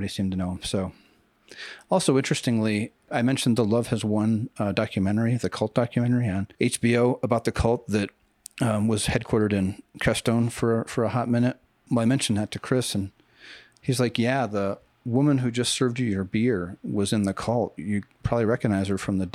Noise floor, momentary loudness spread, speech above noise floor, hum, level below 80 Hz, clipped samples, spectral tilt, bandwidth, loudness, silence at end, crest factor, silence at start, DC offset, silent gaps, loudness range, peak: -49 dBFS; 7 LU; 25 dB; none; -48 dBFS; under 0.1%; -5.5 dB/octave; 14.5 kHz; -25 LUFS; 0.05 s; 18 dB; 0 s; under 0.1%; none; 2 LU; -6 dBFS